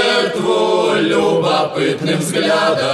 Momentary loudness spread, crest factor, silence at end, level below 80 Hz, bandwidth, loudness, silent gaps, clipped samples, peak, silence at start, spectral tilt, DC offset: 3 LU; 12 dB; 0 s; -58 dBFS; 13 kHz; -15 LUFS; none; under 0.1%; -2 dBFS; 0 s; -4.5 dB/octave; under 0.1%